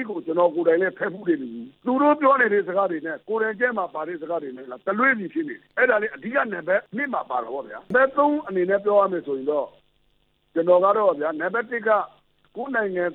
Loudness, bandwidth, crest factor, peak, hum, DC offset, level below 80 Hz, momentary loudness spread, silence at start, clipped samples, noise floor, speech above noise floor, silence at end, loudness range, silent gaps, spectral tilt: -23 LUFS; 4.1 kHz; 16 dB; -6 dBFS; none; under 0.1%; -70 dBFS; 12 LU; 0 s; under 0.1%; -65 dBFS; 43 dB; 0 s; 2 LU; none; -9 dB/octave